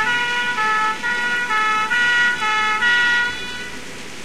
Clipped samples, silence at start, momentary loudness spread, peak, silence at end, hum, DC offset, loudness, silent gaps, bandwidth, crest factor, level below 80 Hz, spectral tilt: under 0.1%; 0 s; 13 LU; -6 dBFS; 0 s; none; 2%; -17 LUFS; none; 15.5 kHz; 12 dB; -54 dBFS; -1 dB/octave